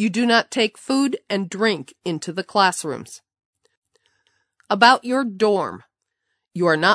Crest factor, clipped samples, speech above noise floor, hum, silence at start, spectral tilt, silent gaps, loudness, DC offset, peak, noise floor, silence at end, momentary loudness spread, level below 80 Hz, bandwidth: 22 dB; under 0.1%; 57 dB; none; 0 s; -4 dB/octave; 3.45-3.53 s, 3.77-3.82 s; -20 LUFS; under 0.1%; 0 dBFS; -77 dBFS; 0 s; 15 LU; -72 dBFS; 11 kHz